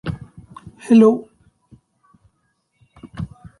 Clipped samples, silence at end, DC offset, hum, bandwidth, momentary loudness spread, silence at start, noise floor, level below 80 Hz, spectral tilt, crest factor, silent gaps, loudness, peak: under 0.1%; 0.35 s; under 0.1%; none; 11 kHz; 28 LU; 0.05 s; -68 dBFS; -48 dBFS; -8 dB/octave; 20 dB; none; -15 LUFS; -2 dBFS